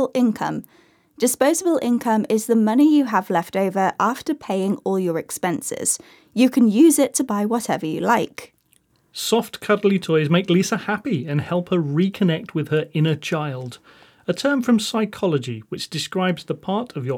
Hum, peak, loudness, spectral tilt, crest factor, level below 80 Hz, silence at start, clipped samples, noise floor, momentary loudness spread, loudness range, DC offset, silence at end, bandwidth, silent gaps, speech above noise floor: none; -4 dBFS; -20 LUFS; -5 dB/octave; 16 dB; -68 dBFS; 0 s; under 0.1%; -61 dBFS; 11 LU; 4 LU; under 0.1%; 0 s; over 20 kHz; none; 41 dB